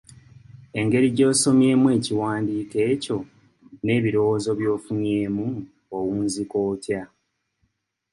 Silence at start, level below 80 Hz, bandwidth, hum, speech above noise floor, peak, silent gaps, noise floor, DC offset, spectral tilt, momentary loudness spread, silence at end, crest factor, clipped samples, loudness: 0.55 s; -58 dBFS; 11.5 kHz; none; 51 dB; -6 dBFS; none; -72 dBFS; under 0.1%; -5.5 dB/octave; 13 LU; 1.05 s; 16 dB; under 0.1%; -22 LUFS